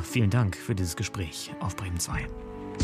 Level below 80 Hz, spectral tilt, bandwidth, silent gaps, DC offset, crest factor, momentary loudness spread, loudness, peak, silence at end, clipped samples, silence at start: -46 dBFS; -5 dB/octave; 15.5 kHz; none; under 0.1%; 18 dB; 12 LU; -30 LUFS; -12 dBFS; 0 s; under 0.1%; 0 s